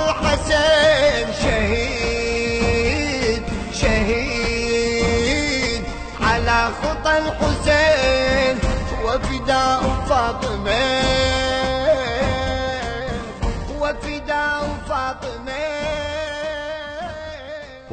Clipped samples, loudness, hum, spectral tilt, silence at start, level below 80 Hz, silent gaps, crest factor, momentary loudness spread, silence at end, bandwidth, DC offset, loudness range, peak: under 0.1%; -20 LUFS; none; -4.5 dB/octave; 0 s; -30 dBFS; none; 16 dB; 10 LU; 0 s; 9 kHz; under 0.1%; 6 LU; -4 dBFS